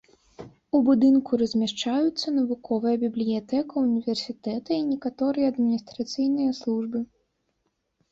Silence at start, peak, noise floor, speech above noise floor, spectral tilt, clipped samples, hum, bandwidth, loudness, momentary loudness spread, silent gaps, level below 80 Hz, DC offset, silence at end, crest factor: 0.4 s; -10 dBFS; -75 dBFS; 51 dB; -5.5 dB/octave; under 0.1%; none; 7.8 kHz; -25 LUFS; 9 LU; none; -66 dBFS; under 0.1%; 1.05 s; 16 dB